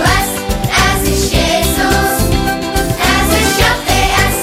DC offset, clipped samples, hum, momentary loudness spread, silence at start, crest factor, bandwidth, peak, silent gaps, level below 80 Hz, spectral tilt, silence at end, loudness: under 0.1%; under 0.1%; none; 5 LU; 0 s; 12 dB; 16.5 kHz; 0 dBFS; none; -20 dBFS; -3.5 dB/octave; 0 s; -12 LUFS